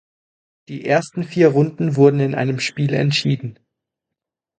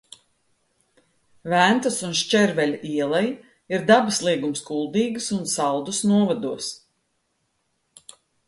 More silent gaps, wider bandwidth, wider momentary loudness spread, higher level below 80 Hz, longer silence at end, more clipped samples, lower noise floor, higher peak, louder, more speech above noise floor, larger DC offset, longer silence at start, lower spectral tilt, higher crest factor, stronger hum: neither; second, 9.2 kHz vs 11.5 kHz; about the same, 11 LU vs 11 LU; about the same, -62 dBFS vs -66 dBFS; second, 1.05 s vs 1.7 s; neither; first, -84 dBFS vs -72 dBFS; about the same, 0 dBFS vs -2 dBFS; first, -18 LUFS vs -22 LUFS; first, 67 dB vs 50 dB; neither; second, 0.7 s vs 1.45 s; first, -6.5 dB/octave vs -4 dB/octave; about the same, 18 dB vs 20 dB; neither